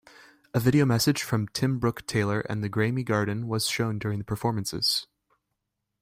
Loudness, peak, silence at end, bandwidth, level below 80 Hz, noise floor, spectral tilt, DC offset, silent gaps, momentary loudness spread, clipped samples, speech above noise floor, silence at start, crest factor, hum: -26 LUFS; -10 dBFS; 1 s; 16 kHz; -56 dBFS; -82 dBFS; -5 dB/octave; under 0.1%; none; 7 LU; under 0.1%; 56 dB; 0.55 s; 18 dB; none